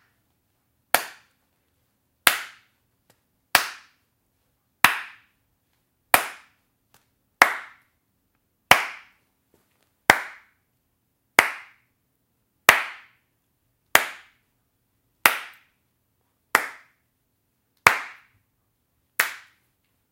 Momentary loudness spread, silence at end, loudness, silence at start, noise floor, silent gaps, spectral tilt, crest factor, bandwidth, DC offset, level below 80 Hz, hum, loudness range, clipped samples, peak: 20 LU; 0.75 s; -21 LUFS; 0.95 s; -73 dBFS; none; -0.5 dB/octave; 28 dB; 16 kHz; under 0.1%; -62 dBFS; none; 4 LU; under 0.1%; 0 dBFS